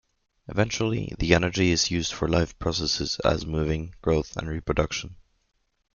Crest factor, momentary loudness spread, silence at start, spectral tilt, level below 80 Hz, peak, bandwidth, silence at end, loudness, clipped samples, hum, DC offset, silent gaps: 24 dB; 8 LU; 0.5 s; -4.5 dB/octave; -40 dBFS; -2 dBFS; 7.4 kHz; 0.8 s; -26 LUFS; under 0.1%; none; under 0.1%; none